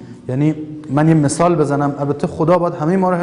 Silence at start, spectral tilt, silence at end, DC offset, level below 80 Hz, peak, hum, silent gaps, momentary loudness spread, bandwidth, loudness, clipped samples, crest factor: 0 s; -7.5 dB/octave; 0 s; under 0.1%; -48 dBFS; -2 dBFS; none; none; 7 LU; 11 kHz; -16 LUFS; under 0.1%; 14 dB